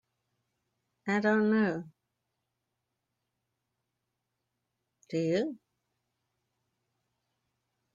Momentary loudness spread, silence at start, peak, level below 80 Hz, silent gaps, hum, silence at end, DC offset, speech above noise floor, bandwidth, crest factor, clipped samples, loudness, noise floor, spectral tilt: 12 LU; 1.05 s; -16 dBFS; -78 dBFS; none; none; 2.4 s; under 0.1%; 56 dB; 7.6 kHz; 20 dB; under 0.1%; -30 LUFS; -85 dBFS; -7 dB/octave